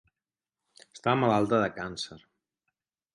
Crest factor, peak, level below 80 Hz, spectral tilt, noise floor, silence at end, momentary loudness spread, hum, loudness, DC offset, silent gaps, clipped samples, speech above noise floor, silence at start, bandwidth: 20 dB; -10 dBFS; -64 dBFS; -6 dB/octave; under -90 dBFS; 0.95 s; 13 LU; none; -28 LUFS; under 0.1%; none; under 0.1%; over 63 dB; 0.95 s; 11.5 kHz